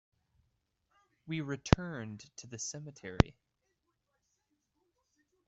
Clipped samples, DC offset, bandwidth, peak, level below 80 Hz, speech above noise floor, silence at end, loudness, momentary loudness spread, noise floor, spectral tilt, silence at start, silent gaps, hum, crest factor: under 0.1%; under 0.1%; 8.2 kHz; -2 dBFS; -48 dBFS; 48 dB; 2.15 s; -34 LUFS; 16 LU; -82 dBFS; -5.5 dB/octave; 1.25 s; none; none; 36 dB